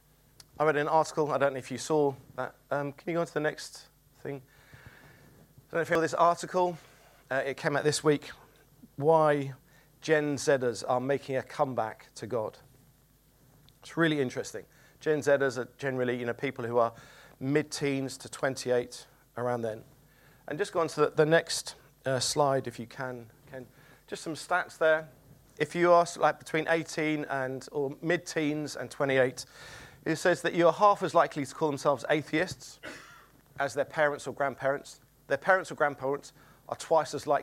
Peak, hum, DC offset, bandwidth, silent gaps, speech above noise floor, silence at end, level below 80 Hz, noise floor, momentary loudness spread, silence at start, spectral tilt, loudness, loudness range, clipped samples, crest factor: -10 dBFS; none; under 0.1%; 16 kHz; none; 34 dB; 0 s; -68 dBFS; -63 dBFS; 17 LU; 0.6 s; -4.5 dB/octave; -29 LUFS; 6 LU; under 0.1%; 22 dB